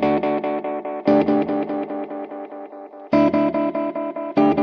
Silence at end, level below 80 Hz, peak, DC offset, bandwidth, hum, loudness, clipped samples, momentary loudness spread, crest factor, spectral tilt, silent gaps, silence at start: 0 s; -58 dBFS; -6 dBFS; under 0.1%; 5.8 kHz; none; -21 LUFS; under 0.1%; 16 LU; 16 dB; -8.5 dB/octave; none; 0 s